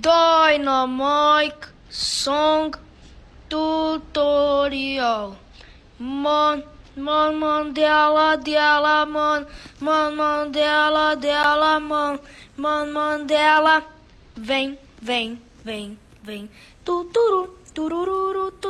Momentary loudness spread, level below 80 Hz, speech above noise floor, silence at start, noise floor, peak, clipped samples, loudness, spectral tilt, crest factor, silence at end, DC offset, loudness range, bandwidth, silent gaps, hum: 17 LU; -50 dBFS; 26 dB; 0 s; -46 dBFS; -6 dBFS; under 0.1%; -20 LUFS; -3 dB/octave; 16 dB; 0 s; under 0.1%; 6 LU; 12 kHz; none; none